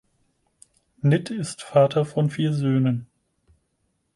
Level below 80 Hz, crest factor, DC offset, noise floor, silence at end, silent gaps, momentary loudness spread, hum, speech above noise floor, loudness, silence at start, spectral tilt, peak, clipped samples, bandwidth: -62 dBFS; 18 dB; under 0.1%; -72 dBFS; 1.1 s; none; 10 LU; none; 51 dB; -23 LUFS; 1.05 s; -7 dB/octave; -6 dBFS; under 0.1%; 11.5 kHz